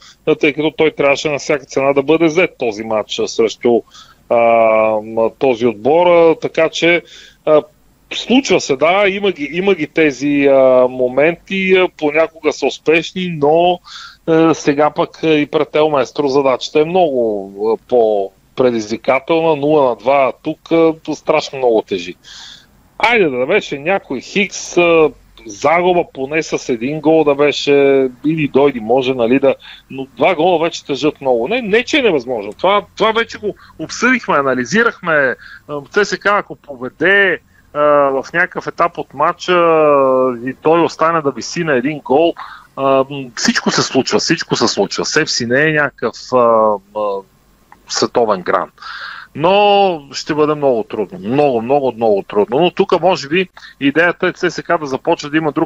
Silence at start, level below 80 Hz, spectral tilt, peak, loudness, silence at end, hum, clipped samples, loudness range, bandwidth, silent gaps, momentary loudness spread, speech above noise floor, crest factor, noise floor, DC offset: 0.25 s; -52 dBFS; -4.5 dB/octave; 0 dBFS; -14 LUFS; 0 s; none; under 0.1%; 2 LU; 8.2 kHz; none; 9 LU; 34 dB; 14 dB; -47 dBFS; under 0.1%